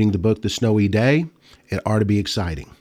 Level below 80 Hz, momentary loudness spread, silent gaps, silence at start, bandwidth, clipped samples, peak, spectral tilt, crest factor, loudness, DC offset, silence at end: -42 dBFS; 10 LU; none; 0 s; 14.5 kHz; under 0.1%; -6 dBFS; -6.5 dB/octave; 14 dB; -20 LUFS; under 0.1%; 0.15 s